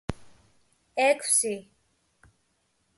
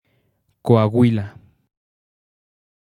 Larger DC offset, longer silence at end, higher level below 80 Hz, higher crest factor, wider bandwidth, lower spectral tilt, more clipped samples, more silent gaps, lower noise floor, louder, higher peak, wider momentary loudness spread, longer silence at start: neither; second, 1.35 s vs 1.7 s; about the same, -56 dBFS vs -60 dBFS; about the same, 20 dB vs 22 dB; about the same, 12 kHz vs 11 kHz; second, -2 dB/octave vs -9.5 dB/octave; neither; neither; first, -72 dBFS vs -66 dBFS; second, -24 LUFS vs -18 LUFS; second, -10 dBFS vs 0 dBFS; about the same, 16 LU vs 15 LU; second, 0.1 s vs 0.65 s